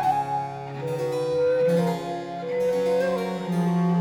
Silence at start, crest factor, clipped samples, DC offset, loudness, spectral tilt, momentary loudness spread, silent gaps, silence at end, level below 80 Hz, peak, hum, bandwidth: 0 s; 12 dB; under 0.1%; under 0.1%; -25 LUFS; -7.5 dB/octave; 9 LU; none; 0 s; -62 dBFS; -12 dBFS; none; 15.5 kHz